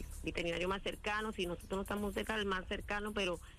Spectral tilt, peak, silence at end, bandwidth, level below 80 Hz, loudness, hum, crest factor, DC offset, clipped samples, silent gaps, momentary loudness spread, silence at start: -4.5 dB/octave; -24 dBFS; 0 s; 15.5 kHz; -50 dBFS; -39 LUFS; none; 14 dB; under 0.1%; under 0.1%; none; 3 LU; 0 s